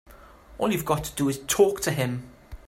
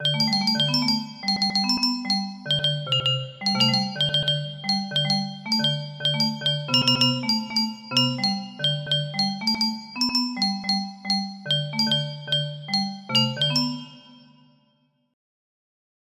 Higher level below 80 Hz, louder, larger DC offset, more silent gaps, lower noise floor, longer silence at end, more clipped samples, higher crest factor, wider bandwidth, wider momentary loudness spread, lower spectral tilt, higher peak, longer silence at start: first, -48 dBFS vs -64 dBFS; second, -25 LUFS vs -22 LUFS; neither; neither; second, -49 dBFS vs -67 dBFS; second, 0.1 s vs 1.95 s; neither; about the same, 20 dB vs 18 dB; first, 16 kHz vs 14.5 kHz; first, 9 LU vs 5 LU; about the same, -4.5 dB/octave vs -4 dB/octave; about the same, -6 dBFS vs -6 dBFS; about the same, 0.1 s vs 0 s